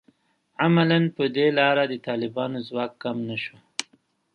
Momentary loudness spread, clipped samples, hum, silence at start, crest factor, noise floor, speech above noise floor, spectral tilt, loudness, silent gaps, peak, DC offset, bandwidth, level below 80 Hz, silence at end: 13 LU; under 0.1%; none; 0.6 s; 24 dB; -65 dBFS; 42 dB; -6 dB/octave; -24 LUFS; none; -2 dBFS; under 0.1%; 11 kHz; -72 dBFS; 0.5 s